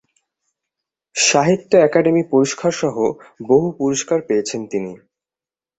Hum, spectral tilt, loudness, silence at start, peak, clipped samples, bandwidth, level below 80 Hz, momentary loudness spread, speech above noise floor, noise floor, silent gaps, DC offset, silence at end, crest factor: none; -4 dB/octave; -17 LUFS; 1.15 s; -2 dBFS; under 0.1%; 8.4 kHz; -60 dBFS; 12 LU; over 73 dB; under -90 dBFS; none; under 0.1%; 0.85 s; 18 dB